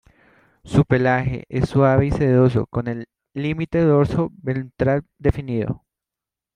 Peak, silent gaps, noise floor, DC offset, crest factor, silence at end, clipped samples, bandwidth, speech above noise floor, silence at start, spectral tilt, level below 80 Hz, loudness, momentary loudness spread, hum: -2 dBFS; none; -88 dBFS; under 0.1%; 18 dB; 0.8 s; under 0.1%; 10 kHz; 69 dB; 0.65 s; -9 dB/octave; -40 dBFS; -20 LUFS; 11 LU; none